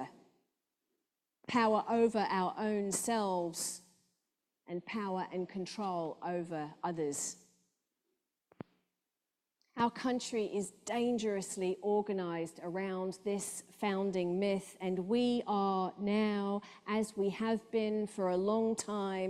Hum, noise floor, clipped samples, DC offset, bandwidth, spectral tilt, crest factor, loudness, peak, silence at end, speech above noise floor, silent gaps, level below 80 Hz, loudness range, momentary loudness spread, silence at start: none; -90 dBFS; under 0.1%; under 0.1%; 14.5 kHz; -4.5 dB/octave; 18 dB; -35 LUFS; -18 dBFS; 0 s; 55 dB; none; -78 dBFS; 7 LU; 9 LU; 0 s